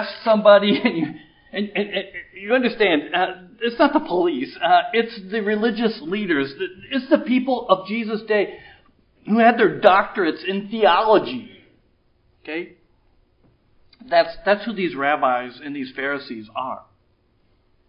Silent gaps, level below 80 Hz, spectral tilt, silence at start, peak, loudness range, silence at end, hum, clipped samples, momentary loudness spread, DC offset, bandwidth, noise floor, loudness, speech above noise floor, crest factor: none; -60 dBFS; -8.5 dB/octave; 0 s; 0 dBFS; 6 LU; 1.1 s; none; under 0.1%; 15 LU; under 0.1%; 5.4 kHz; -62 dBFS; -20 LUFS; 42 dB; 20 dB